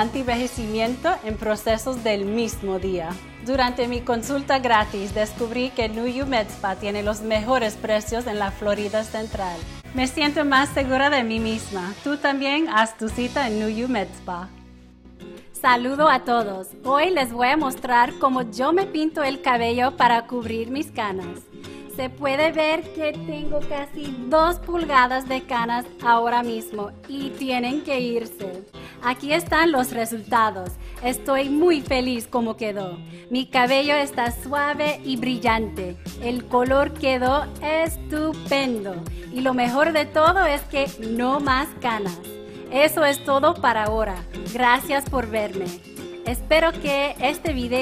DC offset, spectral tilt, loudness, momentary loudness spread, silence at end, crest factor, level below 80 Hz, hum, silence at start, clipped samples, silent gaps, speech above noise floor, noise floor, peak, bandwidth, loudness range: under 0.1%; -4.5 dB/octave; -22 LUFS; 13 LU; 0 s; 20 dB; -42 dBFS; none; 0 s; under 0.1%; none; 24 dB; -46 dBFS; -4 dBFS; 16 kHz; 4 LU